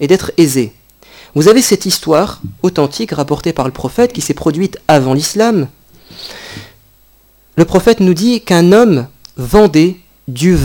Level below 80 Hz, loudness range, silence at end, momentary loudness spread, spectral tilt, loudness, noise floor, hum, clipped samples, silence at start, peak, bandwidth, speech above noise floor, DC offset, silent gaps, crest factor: -34 dBFS; 4 LU; 0 s; 19 LU; -5.5 dB/octave; -11 LUFS; -48 dBFS; none; 0.5%; 0 s; 0 dBFS; 19 kHz; 37 dB; under 0.1%; none; 12 dB